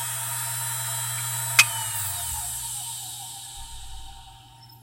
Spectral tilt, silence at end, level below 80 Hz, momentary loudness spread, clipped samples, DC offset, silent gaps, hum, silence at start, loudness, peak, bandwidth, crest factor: 0 dB/octave; 0 s; -48 dBFS; 22 LU; under 0.1%; under 0.1%; none; none; 0 s; -25 LUFS; 0 dBFS; 16 kHz; 28 dB